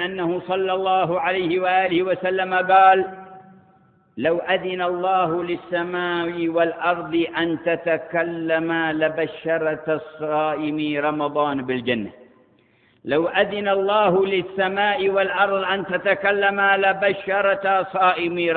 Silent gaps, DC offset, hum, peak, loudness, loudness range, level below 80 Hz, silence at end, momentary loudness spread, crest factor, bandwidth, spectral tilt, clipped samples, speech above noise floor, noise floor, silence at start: none; under 0.1%; none; -4 dBFS; -21 LUFS; 4 LU; -62 dBFS; 0 s; 7 LU; 18 dB; 4.6 kHz; -10 dB/octave; under 0.1%; 38 dB; -58 dBFS; 0 s